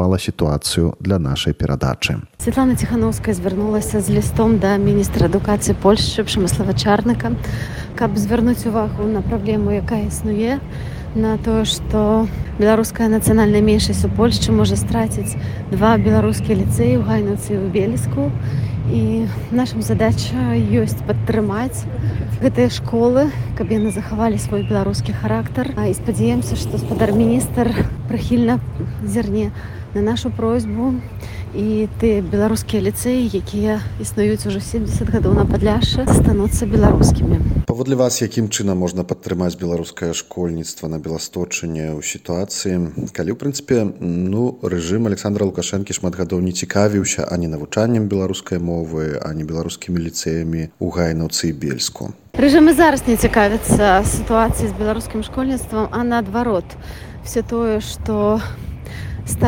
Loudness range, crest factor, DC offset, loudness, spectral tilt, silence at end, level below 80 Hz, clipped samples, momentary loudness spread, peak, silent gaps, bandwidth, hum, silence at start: 6 LU; 16 dB; under 0.1%; -18 LUFS; -6 dB/octave; 0 s; -30 dBFS; under 0.1%; 9 LU; 0 dBFS; none; 17 kHz; none; 0 s